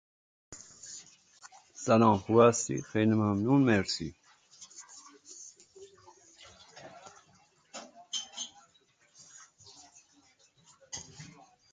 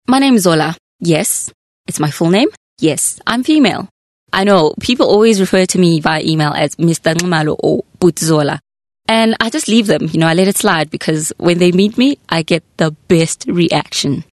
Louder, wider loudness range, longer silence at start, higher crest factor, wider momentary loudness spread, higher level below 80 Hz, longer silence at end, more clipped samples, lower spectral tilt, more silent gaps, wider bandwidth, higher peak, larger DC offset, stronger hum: second, -28 LUFS vs -13 LUFS; first, 24 LU vs 2 LU; first, 0.5 s vs 0.1 s; first, 24 dB vs 12 dB; first, 27 LU vs 8 LU; second, -64 dBFS vs -48 dBFS; first, 0.45 s vs 0.1 s; neither; about the same, -5 dB/octave vs -4.5 dB/octave; second, none vs 0.79-0.99 s, 1.54-1.84 s, 2.57-2.77 s, 3.91-4.27 s; second, 9.6 kHz vs 12.5 kHz; second, -8 dBFS vs 0 dBFS; neither; neither